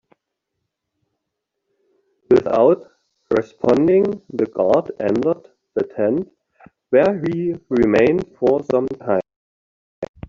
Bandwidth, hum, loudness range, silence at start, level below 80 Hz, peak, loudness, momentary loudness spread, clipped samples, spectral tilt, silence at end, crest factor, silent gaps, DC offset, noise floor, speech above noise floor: 7.2 kHz; none; 3 LU; 2.3 s; -54 dBFS; -4 dBFS; -18 LUFS; 10 LU; under 0.1%; -6.5 dB/octave; 0.25 s; 16 dB; 9.36-10.02 s; under 0.1%; -79 dBFS; 61 dB